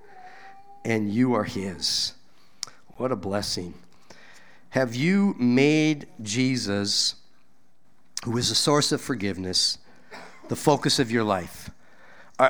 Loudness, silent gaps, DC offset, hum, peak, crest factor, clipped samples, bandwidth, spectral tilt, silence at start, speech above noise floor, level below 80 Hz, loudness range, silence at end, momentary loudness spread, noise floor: -24 LUFS; none; 0.5%; none; -4 dBFS; 22 dB; under 0.1%; over 20 kHz; -4 dB/octave; 0.15 s; 42 dB; -58 dBFS; 5 LU; 0 s; 17 LU; -66 dBFS